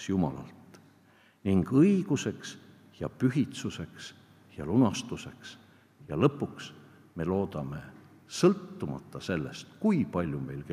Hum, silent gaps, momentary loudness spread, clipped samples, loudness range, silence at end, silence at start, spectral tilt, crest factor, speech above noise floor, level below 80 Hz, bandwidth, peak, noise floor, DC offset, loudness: none; none; 20 LU; under 0.1%; 3 LU; 0 s; 0 s; -6.5 dB/octave; 22 dB; 32 dB; -62 dBFS; 14 kHz; -8 dBFS; -61 dBFS; under 0.1%; -30 LUFS